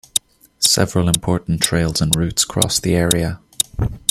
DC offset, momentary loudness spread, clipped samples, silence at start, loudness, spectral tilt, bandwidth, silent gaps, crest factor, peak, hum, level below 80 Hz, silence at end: under 0.1%; 6 LU; under 0.1%; 0.15 s; -17 LUFS; -3.5 dB/octave; 16 kHz; none; 18 dB; 0 dBFS; none; -36 dBFS; 0.15 s